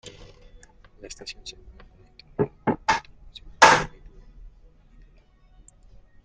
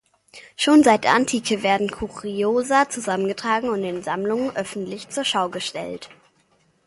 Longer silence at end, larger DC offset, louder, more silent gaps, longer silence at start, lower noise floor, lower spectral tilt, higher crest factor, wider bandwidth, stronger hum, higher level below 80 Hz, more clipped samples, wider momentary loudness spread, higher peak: first, 2.35 s vs 0.8 s; neither; about the same, -21 LUFS vs -21 LUFS; neither; second, 0.05 s vs 0.35 s; second, -55 dBFS vs -62 dBFS; about the same, -3 dB/octave vs -3.5 dB/octave; first, 28 dB vs 20 dB; about the same, 11.5 kHz vs 11.5 kHz; neither; first, -50 dBFS vs -56 dBFS; neither; first, 30 LU vs 14 LU; about the same, 0 dBFS vs -2 dBFS